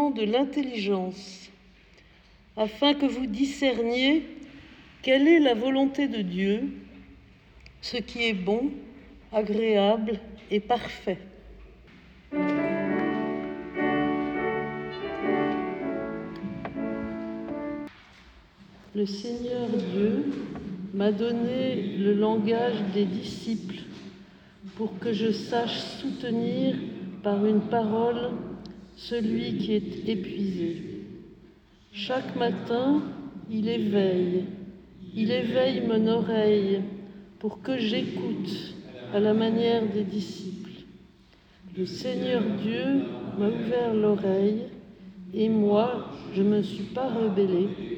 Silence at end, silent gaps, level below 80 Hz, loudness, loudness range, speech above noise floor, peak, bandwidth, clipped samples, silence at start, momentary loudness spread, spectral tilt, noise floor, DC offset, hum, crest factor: 0 s; none; -58 dBFS; -27 LUFS; 6 LU; 31 dB; -10 dBFS; 8.6 kHz; under 0.1%; 0 s; 15 LU; -6.5 dB/octave; -56 dBFS; under 0.1%; none; 18 dB